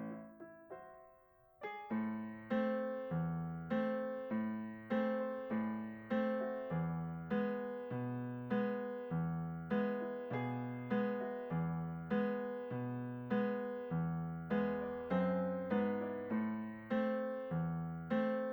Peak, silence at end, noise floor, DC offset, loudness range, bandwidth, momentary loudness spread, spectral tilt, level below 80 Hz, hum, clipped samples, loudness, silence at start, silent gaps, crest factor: -24 dBFS; 0 s; -67 dBFS; under 0.1%; 2 LU; over 20 kHz; 6 LU; -10 dB/octave; -70 dBFS; none; under 0.1%; -40 LUFS; 0 s; none; 14 dB